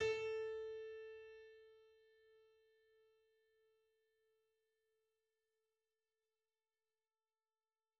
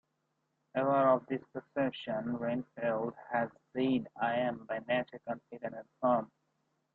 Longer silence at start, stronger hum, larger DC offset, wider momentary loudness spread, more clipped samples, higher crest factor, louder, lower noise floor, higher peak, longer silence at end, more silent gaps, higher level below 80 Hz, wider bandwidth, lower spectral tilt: second, 0 s vs 0.75 s; neither; neither; first, 22 LU vs 12 LU; neither; about the same, 22 dB vs 20 dB; second, -47 LUFS vs -34 LUFS; first, under -90 dBFS vs -81 dBFS; second, -30 dBFS vs -14 dBFS; first, 5.6 s vs 0.7 s; neither; second, -82 dBFS vs -74 dBFS; first, 7.6 kHz vs 4.4 kHz; second, -1 dB/octave vs -4.5 dB/octave